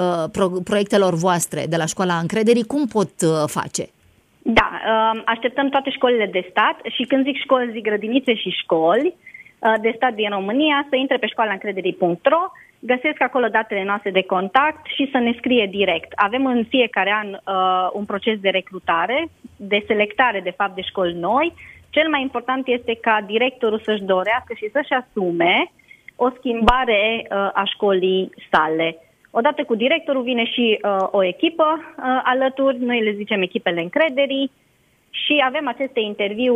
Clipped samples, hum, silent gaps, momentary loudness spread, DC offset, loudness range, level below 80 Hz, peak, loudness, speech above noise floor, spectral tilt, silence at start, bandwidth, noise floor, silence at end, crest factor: under 0.1%; none; none; 6 LU; under 0.1%; 2 LU; -46 dBFS; 0 dBFS; -19 LUFS; 40 dB; -4.5 dB/octave; 0 s; 15.5 kHz; -60 dBFS; 0 s; 20 dB